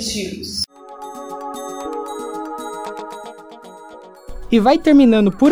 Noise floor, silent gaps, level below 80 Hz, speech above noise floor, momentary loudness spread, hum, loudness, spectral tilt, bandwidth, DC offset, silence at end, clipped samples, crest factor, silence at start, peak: -39 dBFS; none; -42 dBFS; 26 dB; 27 LU; none; -18 LUFS; -5 dB/octave; over 20 kHz; under 0.1%; 0 s; under 0.1%; 16 dB; 0 s; -2 dBFS